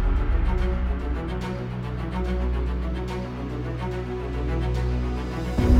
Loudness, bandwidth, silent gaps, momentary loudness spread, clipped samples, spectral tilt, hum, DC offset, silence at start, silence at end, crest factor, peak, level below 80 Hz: -28 LUFS; 8 kHz; none; 6 LU; under 0.1%; -8 dB/octave; none; under 0.1%; 0 s; 0 s; 18 dB; -6 dBFS; -26 dBFS